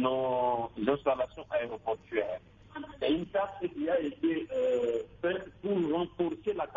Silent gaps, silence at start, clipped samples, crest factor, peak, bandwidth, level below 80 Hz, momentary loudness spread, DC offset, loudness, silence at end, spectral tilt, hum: none; 0 s; under 0.1%; 20 dB; -12 dBFS; 7.4 kHz; -62 dBFS; 7 LU; under 0.1%; -32 LUFS; 0 s; -7 dB/octave; none